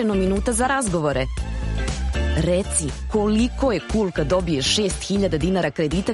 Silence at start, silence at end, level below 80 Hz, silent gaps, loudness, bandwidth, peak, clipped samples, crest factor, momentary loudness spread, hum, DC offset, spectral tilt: 0 s; 0 s; -30 dBFS; none; -22 LUFS; 11.5 kHz; -6 dBFS; under 0.1%; 14 dB; 6 LU; none; under 0.1%; -4.5 dB/octave